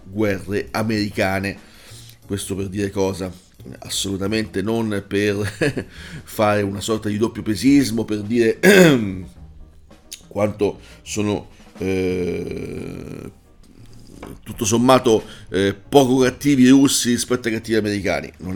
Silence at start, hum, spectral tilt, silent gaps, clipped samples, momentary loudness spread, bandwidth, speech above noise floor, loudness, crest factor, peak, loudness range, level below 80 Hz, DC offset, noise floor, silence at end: 0.05 s; none; -5 dB/octave; none; under 0.1%; 19 LU; 19 kHz; 26 dB; -19 LUFS; 20 dB; 0 dBFS; 9 LU; -46 dBFS; under 0.1%; -45 dBFS; 0 s